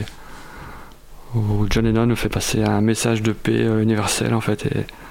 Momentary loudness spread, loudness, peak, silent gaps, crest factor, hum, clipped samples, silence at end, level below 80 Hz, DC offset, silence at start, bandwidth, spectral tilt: 20 LU; -20 LUFS; -6 dBFS; none; 16 dB; none; under 0.1%; 0 s; -34 dBFS; under 0.1%; 0 s; 16.5 kHz; -5.5 dB/octave